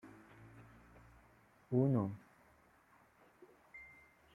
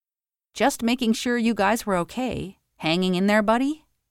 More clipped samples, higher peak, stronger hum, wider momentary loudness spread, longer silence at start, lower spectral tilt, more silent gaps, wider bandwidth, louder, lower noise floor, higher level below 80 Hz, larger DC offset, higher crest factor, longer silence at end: neither; second, -20 dBFS vs -8 dBFS; neither; first, 28 LU vs 11 LU; second, 0.05 s vs 0.55 s; first, -10.5 dB/octave vs -5 dB/octave; neither; second, 3.7 kHz vs 16.5 kHz; second, -36 LUFS vs -23 LUFS; second, -69 dBFS vs under -90 dBFS; second, -72 dBFS vs -52 dBFS; neither; first, 22 dB vs 16 dB; first, 0.5 s vs 0.35 s